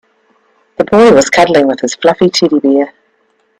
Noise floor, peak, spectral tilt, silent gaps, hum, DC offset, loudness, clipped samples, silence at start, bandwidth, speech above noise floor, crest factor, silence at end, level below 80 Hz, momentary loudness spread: -57 dBFS; 0 dBFS; -4.5 dB/octave; none; none; under 0.1%; -9 LUFS; under 0.1%; 0.8 s; 14 kHz; 48 dB; 10 dB; 0.7 s; -48 dBFS; 10 LU